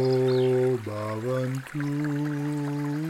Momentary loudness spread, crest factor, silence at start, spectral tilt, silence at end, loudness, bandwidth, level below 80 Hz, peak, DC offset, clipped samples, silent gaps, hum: 8 LU; 12 dB; 0 s; -7.5 dB/octave; 0 s; -27 LUFS; 15.5 kHz; -66 dBFS; -14 dBFS; under 0.1%; under 0.1%; none; none